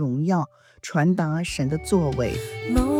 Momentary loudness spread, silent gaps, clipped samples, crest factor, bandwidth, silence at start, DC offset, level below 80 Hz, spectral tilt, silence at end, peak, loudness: 7 LU; none; under 0.1%; 16 dB; 15.5 kHz; 0 s; under 0.1%; -36 dBFS; -6.5 dB/octave; 0 s; -6 dBFS; -24 LUFS